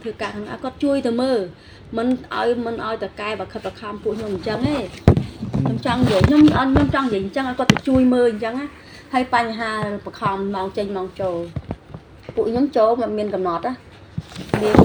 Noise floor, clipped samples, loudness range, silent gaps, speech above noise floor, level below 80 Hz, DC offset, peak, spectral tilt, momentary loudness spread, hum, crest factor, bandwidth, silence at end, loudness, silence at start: -40 dBFS; under 0.1%; 7 LU; none; 20 dB; -40 dBFS; under 0.1%; 0 dBFS; -7 dB/octave; 14 LU; none; 20 dB; over 20 kHz; 0 s; -20 LUFS; 0 s